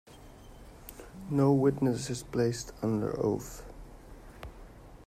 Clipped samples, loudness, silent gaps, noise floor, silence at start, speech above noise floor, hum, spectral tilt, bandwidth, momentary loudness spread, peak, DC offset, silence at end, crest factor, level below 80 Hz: under 0.1%; -30 LUFS; none; -51 dBFS; 0.1 s; 22 dB; none; -7 dB/octave; 16 kHz; 26 LU; -14 dBFS; under 0.1%; 0 s; 18 dB; -52 dBFS